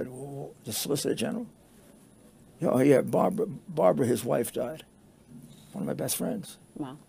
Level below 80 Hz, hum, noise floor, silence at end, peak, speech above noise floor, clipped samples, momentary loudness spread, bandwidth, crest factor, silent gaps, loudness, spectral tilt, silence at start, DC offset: -66 dBFS; none; -55 dBFS; 0.1 s; -8 dBFS; 28 dB; under 0.1%; 17 LU; 16 kHz; 20 dB; none; -28 LUFS; -5.5 dB/octave; 0 s; under 0.1%